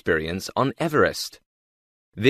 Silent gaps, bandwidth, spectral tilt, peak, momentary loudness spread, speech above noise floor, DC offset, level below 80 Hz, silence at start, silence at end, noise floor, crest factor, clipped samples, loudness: 1.46-2.12 s; 14 kHz; -5 dB/octave; -4 dBFS; 10 LU; over 67 dB; under 0.1%; -52 dBFS; 0.05 s; 0 s; under -90 dBFS; 20 dB; under 0.1%; -24 LUFS